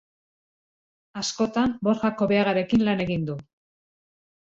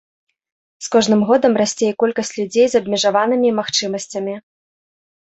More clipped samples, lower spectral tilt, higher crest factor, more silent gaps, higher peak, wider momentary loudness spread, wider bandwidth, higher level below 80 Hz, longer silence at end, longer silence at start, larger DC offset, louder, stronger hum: neither; first, -5.5 dB/octave vs -4 dB/octave; about the same, 16 dB vs 16 dB; neither; second, -10 dBFS vs -2 dBFS; about the same, 10 LU vs 11 LU; about the same, 7.8 kHz vs 8.2 kHz; first, -54 dBFS vs -62 dBFS; about the same, 1 s vs 1 s; first, 1.15 s vs 0.8 s; neither; second, -24 LUFS vs -17 LUFS; neither